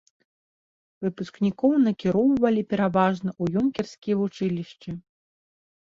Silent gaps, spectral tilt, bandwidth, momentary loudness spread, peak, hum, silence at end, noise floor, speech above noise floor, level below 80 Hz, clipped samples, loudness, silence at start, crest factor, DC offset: 3.98-4.02 s; -8 dB/octave; 7.6 kHz; 12 LU; -6 dBFS; none; 0.95 s; under -90 dBFS; over 66 dB; -60 dBFS; under 0.1%; -24 LUFS; 1 s; 18 dB; under 0.1%